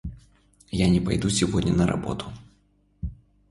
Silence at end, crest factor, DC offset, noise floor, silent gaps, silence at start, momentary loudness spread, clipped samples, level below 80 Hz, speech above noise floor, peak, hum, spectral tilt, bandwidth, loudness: 0.35 s; 18 dB; under 0.1%; -63 dBFS; none; 0.05 s; 17 LU; under 0.1%; -40 dBFS; 40 dB; -8 dBFS; 50 Hz at -45 dBFS; -5.5 dB/octave; 11.5 kHz; -24 LUFS